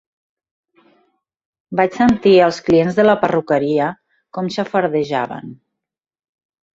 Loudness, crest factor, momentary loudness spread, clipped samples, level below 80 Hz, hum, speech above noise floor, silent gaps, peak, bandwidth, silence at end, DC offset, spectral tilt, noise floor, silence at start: -16 LUFS; 16 dB; 14 LU; under 0.1%; -54 dBFS; none; 67 dB; none; -2 dBFS; 7.8 kHz; 1.2 s; under 0.1%; -6.5 dB/octave; -82 dBFS; 1.7 s